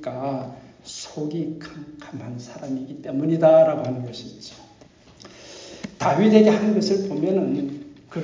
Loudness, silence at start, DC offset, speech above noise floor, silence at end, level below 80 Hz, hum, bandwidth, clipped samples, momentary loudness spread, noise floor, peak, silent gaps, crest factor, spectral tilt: -21 LUFS; 0 s; under 0.1%; 29 dB; 0 s; -62 dBFS; none; 7.6 kHz; under 0.1%; 24 LU; -50 dBFS; -2 dBFS; none; 22 dB; -6.5 dB/octave